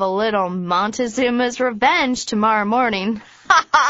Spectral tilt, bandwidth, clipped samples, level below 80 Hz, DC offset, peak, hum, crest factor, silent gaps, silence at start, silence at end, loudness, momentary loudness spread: -2.5 dB/octave; 8 kHz; under 0.1%; -54 dBFS; under 0.1%; 0 dBFS; none; 18 dB; none; 0 s; 0 s; -18 LUFS; 5 LU